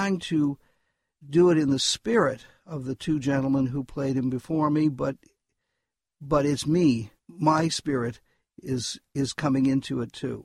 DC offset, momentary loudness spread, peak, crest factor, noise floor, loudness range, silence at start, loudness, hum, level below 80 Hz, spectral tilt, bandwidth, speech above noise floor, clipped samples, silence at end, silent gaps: under 0.1%; 11 LU; -8 dBFS; 18 dB; -84 dBFS; 2 LU; 0 s; -25 LUFS; none; -54 dBFS; -5.5 dB/octave; 12.5 kHz; 59 dB; under 0.1%; 0 s; none